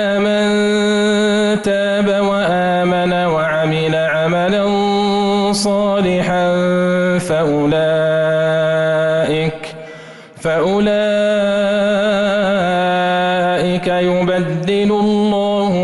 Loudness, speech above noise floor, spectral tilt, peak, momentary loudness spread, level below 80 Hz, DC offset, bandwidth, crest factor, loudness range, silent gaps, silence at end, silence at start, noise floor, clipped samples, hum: -15 LUFS; 21 dB; -5.5 dB/octave; -6 dBFS; 2 LU; -48 dBFS; under 0.1%; 11.5 kHz; 8 dB; 2 LU; none; 0 s; 0 s; -36 dBFS; under 0.1%; none